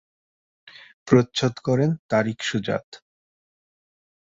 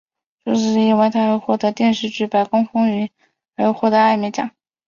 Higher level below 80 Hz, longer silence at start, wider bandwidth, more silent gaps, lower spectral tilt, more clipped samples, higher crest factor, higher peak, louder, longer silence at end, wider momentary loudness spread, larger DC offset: about the same, -60 dBFS vs -62 dBFS; first, 1.05 s vs 0.45 s; about the same, 7.8 kHz vs 7.2 kHz; first, 1.99-2.09 s, 2.84-2.92 s vs none; about the same, -6 dB/octave vs -6 dB/octave; neither; first, 24 dB vs 16 dB; about the same, -2 dBFS vs -2 dBFS; second, -23 LUFS vs -18 LUFS; first, 1.35 s vs 0.4 s; about the same, 9 LU vs 11 LU; neither